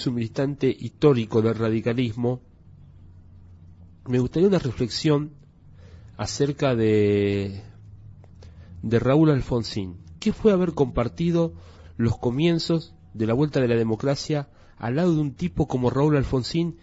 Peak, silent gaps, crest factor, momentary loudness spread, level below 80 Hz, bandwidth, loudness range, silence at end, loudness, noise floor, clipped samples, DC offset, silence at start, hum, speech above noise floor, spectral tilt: -6 dBFS; none; 18 dB; 10 LU; -46 dBFS; 8 kHz; 3 LU; 0.1 s; -23 LUFS; -48 dBFS; under 0.1%; under 0.1%; 0 s; none; 26 dB; -7 dB/octave